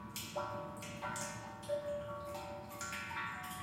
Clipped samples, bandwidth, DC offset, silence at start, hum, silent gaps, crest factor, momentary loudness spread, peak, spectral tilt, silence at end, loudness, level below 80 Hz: under 0.1%; 16.5 kHz; under 0.1%; 0 s; none; none; 16 dB; 5 LU; -28 dBFS; -3.5 dB/octave; 0 s; -43 LUFS; -66 dBFS